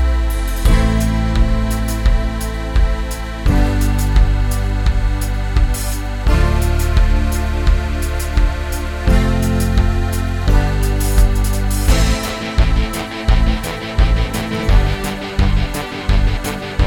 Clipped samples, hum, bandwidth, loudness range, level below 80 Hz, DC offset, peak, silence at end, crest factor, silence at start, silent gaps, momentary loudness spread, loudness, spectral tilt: under 0.1%; none; 18 kHz; 1 LU; -16 dBFS; under 0.1%; 0 dBFS; 0 s; 14 dB; 0 s; none; 6 LU; -18 LUFS; -5.5 dB/octave